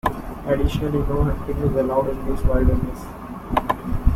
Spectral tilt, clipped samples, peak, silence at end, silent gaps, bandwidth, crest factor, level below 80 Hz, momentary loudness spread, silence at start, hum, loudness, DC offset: -8 dB/octave; under 0.1%; -2 dBFS; 0 s; none; 16 kHz; 18 dB; -26 dBFS; 10 LU; 0.05 s; none; -23 LUFS; under 0.1%